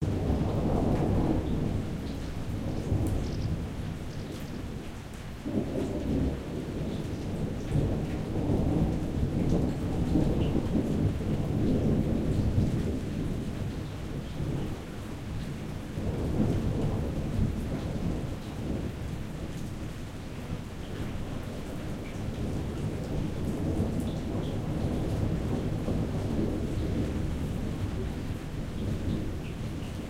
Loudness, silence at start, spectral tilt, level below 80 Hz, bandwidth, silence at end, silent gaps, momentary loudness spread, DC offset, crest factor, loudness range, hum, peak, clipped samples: -32 LUFS; 0 s; -7.5 dB/octave; -38 dBFS; 16 kHz; 0 s; none; 10 LU; under 0.1%; 16 dB; 7 LU; none; -14 dBFS; under 0.1%